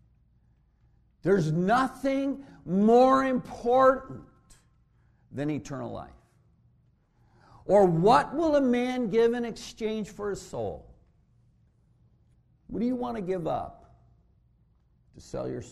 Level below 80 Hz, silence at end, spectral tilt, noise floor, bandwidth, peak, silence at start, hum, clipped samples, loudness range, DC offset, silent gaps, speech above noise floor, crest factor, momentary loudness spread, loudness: -56 dBFS; 0 s; -7 dB/octave; -65 dBFS; 13 kHz; -8 dBFS; 1.25 s; none; under 0.1%; 13 LU; under 0.1%; none; 39 dB; 22 dB; 18 LU; -26 LUFS